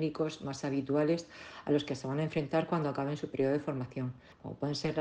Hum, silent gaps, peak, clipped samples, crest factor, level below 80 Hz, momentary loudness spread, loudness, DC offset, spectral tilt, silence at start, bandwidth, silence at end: none; none; -16 dBFS; under 0.1%; 16 dB; -66 dBFS; 10 LU; -34 LUFS; under 0.1%; -6.5 dB/octave; 0 s; 9.6 kHz; 0 s